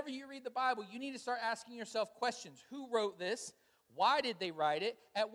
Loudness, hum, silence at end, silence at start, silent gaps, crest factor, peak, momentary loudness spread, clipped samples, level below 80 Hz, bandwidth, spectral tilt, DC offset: -38 LUFS; none; 0 s; 0 s; none; 20 dB; -18 dBFS; 13 LU; under 0.1%; -88 dBFS; 16 kHz; -2.5 dB/octave; under 0.1%